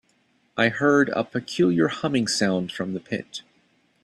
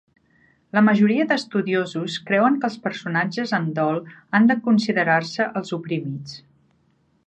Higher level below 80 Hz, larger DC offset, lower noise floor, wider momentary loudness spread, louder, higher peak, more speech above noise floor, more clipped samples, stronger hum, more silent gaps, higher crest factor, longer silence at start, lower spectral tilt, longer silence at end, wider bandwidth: first, -64 dBFS vs -70 dBFS; neither; about the same, -65 dBFS vs -63 dBFS; about the same, 12 LU vs 11 LU; about the same, -23 LUFS vs -21 LUFS; about the same, -6 dBFS vs -4 dBFS; about the same, 42 dB vs 43 dB; neither; neither; neither; about the same, 18 dB vs 18 dB; second, 0.55 s vs 0.75 s; second, -5 dB/octave vs -6.5 dB/octave; second, 0.65 s vs 0.9 s; first, 12.5 kHz vs 8.6 kHz